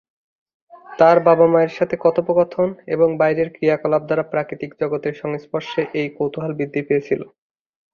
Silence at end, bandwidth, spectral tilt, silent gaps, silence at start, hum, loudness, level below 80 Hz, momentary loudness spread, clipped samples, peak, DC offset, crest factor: 0.7 s; 6.8 kHz; -8 dB/octave; none; 0.75 s; none; -19 LUFS; -60 dBFS; 12 LU; under 0.1%; -2 dBFS; under 0.1%; 18 dB